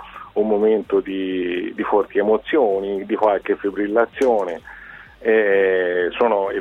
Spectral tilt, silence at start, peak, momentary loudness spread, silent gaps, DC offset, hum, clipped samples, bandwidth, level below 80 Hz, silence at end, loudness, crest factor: -6.5 dB/octave; 0 s; -4 dBFS; 8 LU; none; under 0.1%; none; under 0.1%; 7.8 kHz; -54 dBFS; 0 s; -19 LUFS; 16 dB